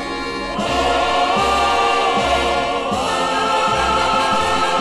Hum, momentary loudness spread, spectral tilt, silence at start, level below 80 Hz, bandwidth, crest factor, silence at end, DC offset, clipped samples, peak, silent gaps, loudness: none; 4 LU; -3 dB/octave; 0 s; -36 dBFS; 15 kHz; 12 dB; 0 s; under 0.1%; under 0.1%; -6 dBFS; none; -17 LUFS